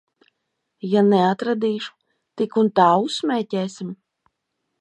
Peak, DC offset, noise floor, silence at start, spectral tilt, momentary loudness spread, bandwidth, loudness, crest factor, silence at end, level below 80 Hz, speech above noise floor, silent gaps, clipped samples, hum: -2 dBFS; under 0.1%; -77 dBFS; 0.85 s; -6.5 dB/octave; 18 LU; 10 kHz; -20 LUFS; 20 dB; 0.85 s; -74 dBFS; 58 dB; none; under 0.1%; none